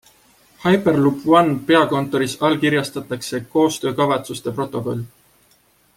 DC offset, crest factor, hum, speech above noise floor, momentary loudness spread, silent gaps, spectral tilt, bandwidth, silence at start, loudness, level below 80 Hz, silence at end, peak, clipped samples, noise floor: under 0.1%; 18 dB; none; 39 dB; 12 LU; none; -5.5 dB/octave; 16.5 kHz; 0.6 s; -19 LUFS; -58 dBFS; 0.9 s; -2 dBFS; under 0.1%; -57 dBFS